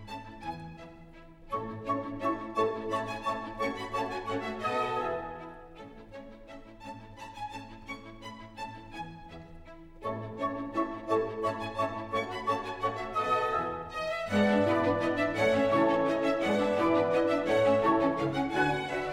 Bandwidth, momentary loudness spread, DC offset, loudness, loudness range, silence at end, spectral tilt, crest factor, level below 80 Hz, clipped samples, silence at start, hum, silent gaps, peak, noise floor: 14 kHz; 21 LU; under 0.1%; -30 LUFS; 17 LU; 0 s; -6 dB/octave; 16 dB; -54 dBFS; under 0.1%; 0 s; none; none; -14 dBFS; -51 dBFS